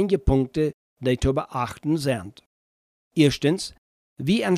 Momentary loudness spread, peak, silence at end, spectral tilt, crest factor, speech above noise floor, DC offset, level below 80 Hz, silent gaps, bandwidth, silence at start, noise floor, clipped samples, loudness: 10 LU; -6 dBFS; 0 s; -6 dB/octave; 18 dB; over 68 dB; under 0.1%; -36 dBFS; 0.74-0.96 s, 2.46-3.11 s, 3.78-4.16 s; 15 kHz; 0 s; under -90 dBFS; under 0.1%; -24 LUFS